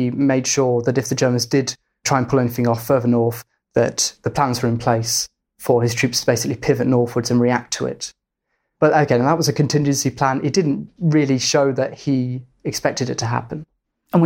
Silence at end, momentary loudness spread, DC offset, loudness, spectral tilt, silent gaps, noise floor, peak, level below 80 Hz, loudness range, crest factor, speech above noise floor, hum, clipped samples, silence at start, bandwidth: 0 s; 8 LU; under 0.1%; -19 LUFS; -5 dB/octave; none; -74 dBFS; -2 dBFS; -52 dBFS; 2 LU; 18 dB; 56 dB; none; under 0.1%; 0 s; 17 kHz